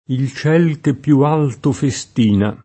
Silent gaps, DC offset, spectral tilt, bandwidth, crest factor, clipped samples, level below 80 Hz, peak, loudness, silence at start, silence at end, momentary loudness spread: none; under 0.1%; -7 dB/octave; 8.8 kHz; 14 dB; under 0.1%; -52 dBFS; -2 dBFS; -16 LUFS; 0.1 s; 0.1 s; 6 LU